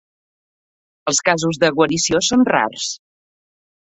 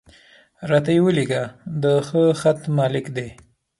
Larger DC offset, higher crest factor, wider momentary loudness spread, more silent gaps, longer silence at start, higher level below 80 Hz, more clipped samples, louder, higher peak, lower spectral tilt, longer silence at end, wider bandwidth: neither; about the same, 18 dB vs 16 dB; second, 10 LU vs 13 LU; neither; first, 1.05 s vs 0.6 s; about the same, -54 dBFS vs -58 dBFS; neither; first, -17 LUFS vs -20 LUFS; about the same, -2 dBFS vs -4 dBFS; second, -3 dB/octave vs -7 dB/octave; first, 1 s vs 0.5 s; second, 8.4 kHz vs 11.5 kHz